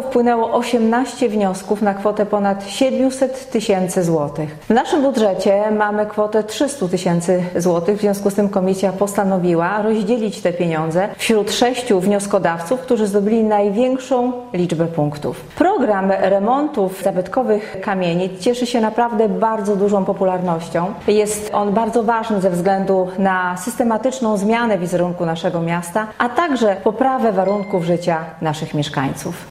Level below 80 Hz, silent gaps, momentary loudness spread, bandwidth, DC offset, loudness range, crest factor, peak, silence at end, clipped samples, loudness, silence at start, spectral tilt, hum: -52 dBFS; none; 5 LU; 16 kHz; under 0.1%; 1 LU; 16 dB; -2 dBFS; 0 s; under 0.1%; -18 LUFS; 0 s; -5.5 dB/octave; none